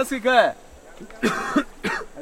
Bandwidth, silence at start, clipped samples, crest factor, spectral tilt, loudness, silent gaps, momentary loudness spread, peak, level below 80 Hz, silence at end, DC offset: 16.5 kHz; 0 s; under 0.1%; 20 dB; -4 dB/octave; -22 LUFS; none; 15 LU; -4 dBFS; -48 dBFS; 0 s; under 0.1%